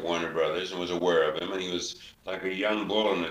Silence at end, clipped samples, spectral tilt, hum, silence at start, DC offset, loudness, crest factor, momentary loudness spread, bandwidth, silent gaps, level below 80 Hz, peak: 0 s; under 0.1%; -4 dB/octave; none; 0 s; under 0.1%; -29 LUFS; 16 dB; 9 LU; 15.5 kHz; none; -62 dBFS; -12 dBFS